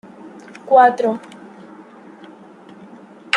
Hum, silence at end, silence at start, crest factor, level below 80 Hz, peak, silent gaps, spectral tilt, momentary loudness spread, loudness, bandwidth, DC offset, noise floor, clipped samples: none; 0 s; 0.25 s; 18 dB; -74 dBFS; -2 dBFS; none; -4 dB/octave; 27 LU; -15 LUFS; 10.5 kHz; under 0.1%; -42 dBFS; under 0.1%